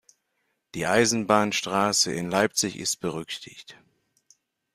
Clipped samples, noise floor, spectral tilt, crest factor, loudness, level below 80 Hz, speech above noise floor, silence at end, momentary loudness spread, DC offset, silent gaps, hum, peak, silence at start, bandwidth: under 0.1%; -76 dBFS; -3 dB/octave; 22 dB; -24 LUFS; -62 dBFS; 51 dB; 1 s; 15 LU; under 0.1%; none; none; -6 dBFS; 0.75 s; 15.5 kHz